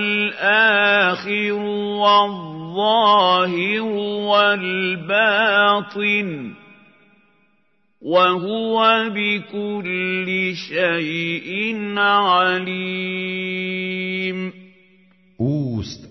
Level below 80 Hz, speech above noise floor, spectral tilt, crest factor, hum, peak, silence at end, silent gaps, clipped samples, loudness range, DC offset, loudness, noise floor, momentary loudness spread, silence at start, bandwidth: -62 dBFS; 47 dB; -5.5 dB/octave; 16 dB; none; -2 dBFS; 0.05 s; none; under 0.1%; 5 LU; under 0.1%; -18 LUFS; -66 dBFS; 10 LU; 0 s; 6.2 kHz